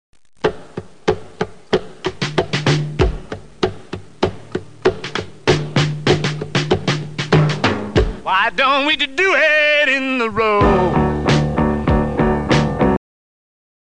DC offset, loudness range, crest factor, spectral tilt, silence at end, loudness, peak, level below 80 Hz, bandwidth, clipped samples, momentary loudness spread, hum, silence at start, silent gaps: 0.8%; 7 LU; 16 dB; -5.5 dB/octave; 0.85 s; -17 LUFS; -2 dBFS; -30 dBFS; 9.8 kHz; under 0.1%; 11 LU; none; 0.45 s; none